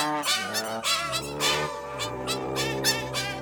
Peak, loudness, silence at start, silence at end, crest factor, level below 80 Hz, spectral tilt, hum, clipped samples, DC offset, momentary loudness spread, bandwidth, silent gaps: -10 dBFS; -26 LUFS; 0 s; 0 s; 18 dB; -54 dBFS; -2 dB/octave; none; under 0.1%; under 0.1%; 7 LU; over 20 kHz; none